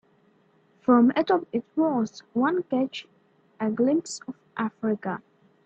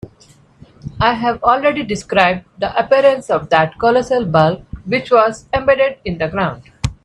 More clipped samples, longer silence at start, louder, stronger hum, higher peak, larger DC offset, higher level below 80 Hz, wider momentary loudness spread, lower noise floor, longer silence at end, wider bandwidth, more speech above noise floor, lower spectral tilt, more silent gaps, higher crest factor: neither; first, 0.9 s vs 0.05 s; second, -25 LUFS vs -15 LUFS; neither; second, -6 dBFS vs 0 dBFS; neither; second, -72 dBFS vs -40 dBFS; first, 16 LU vs 9 LU; first, -63 dBFS vs -48 dBFS; first, 0.45 s vs 0.1 s; second, 8.6 kHz vs 11 kHz; first, 38 dB vs 33 dB; about the same, -5.5 dB/octave vs -5.5 dB/octave; neither; about the same, 20 dB vs 16 dB